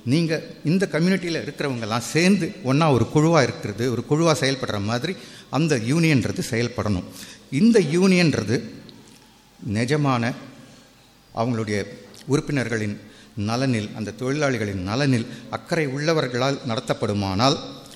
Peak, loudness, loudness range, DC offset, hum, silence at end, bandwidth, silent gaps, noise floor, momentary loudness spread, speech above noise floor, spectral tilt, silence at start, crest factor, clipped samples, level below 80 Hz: -4 dBFS; -22 LUFS; 6 LU; under 0.1%; none; 0 s; 14.5 kHz; none; -52 dBFS; 12 LU; 30 dB; -5.5 dB/octave; 0.05 s; 20 dB; under 0.1%; -54 dBFS